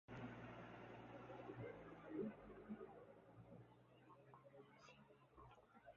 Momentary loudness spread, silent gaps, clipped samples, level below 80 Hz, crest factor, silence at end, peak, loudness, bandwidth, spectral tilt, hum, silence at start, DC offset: 15 LU; none; under 0.1%; -78 dBFS; 20 dB; 0 s; -38 dBFS; -58 LUFS; 6.8 kHz; -6 dB/octave; none; 0.1 s; under 0.1%